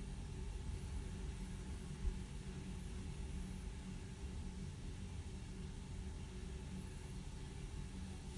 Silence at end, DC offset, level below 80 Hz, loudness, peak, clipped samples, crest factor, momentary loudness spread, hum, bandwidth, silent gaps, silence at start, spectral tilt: 0 s; under 0.1%; -50 dBFS; -50 LUFS; -30 dBFS; under 0.1%; 18 dB; 3 LU; none; 11.5 kHz; none; 0 s; -5.5 dB/octave